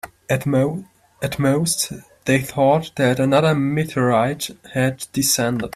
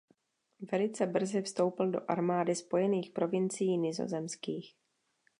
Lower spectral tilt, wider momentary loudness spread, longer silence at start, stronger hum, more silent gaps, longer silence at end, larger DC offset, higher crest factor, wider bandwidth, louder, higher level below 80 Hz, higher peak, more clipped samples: about the same, -5 dB/octave vs -5.5 dB/octave; about the same, 9 LU vs 7 LU; second, 0.05 s vs 0.6 s; neither; neither; second, 0.05 s vs 0.7 s; neither; about the same, 16 dB vs 18 dB; first, 16 kHz vs 11.5 kHz; first, -19 LUFS vs -33 LUFS; first, -52 dBFS vs -84 dBFS; first, -4 dBFS vs -16 dBFS; neither